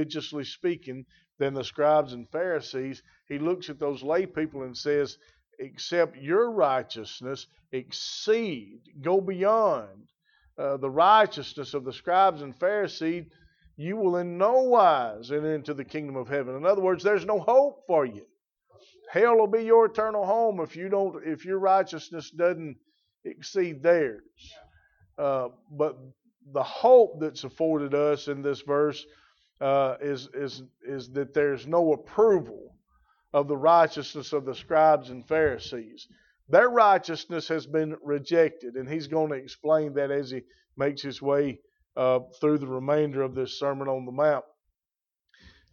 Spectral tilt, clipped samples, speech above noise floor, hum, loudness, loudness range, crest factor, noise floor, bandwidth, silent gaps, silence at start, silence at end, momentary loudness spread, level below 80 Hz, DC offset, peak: -6 dB/octave; under 0.1%; over 64 dB; none; -26 LUFS; 5 LU; 20 dB; under -90 dBFS; 7.2 kHz; none; 0 s; 1.3 s; 16 LU; -68 dBFS; under 0.1%; -6 dBFS